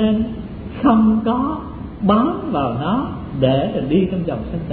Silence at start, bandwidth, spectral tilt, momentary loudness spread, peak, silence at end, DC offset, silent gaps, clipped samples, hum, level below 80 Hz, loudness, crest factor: 0 s; 4.4 kHz; -11.5 dB/octave; 11 LU; -2 dBFS; 0 s; under 0.1%; none; under 0.1%; none; -38 dBFS; -18 LUFS; 16 dB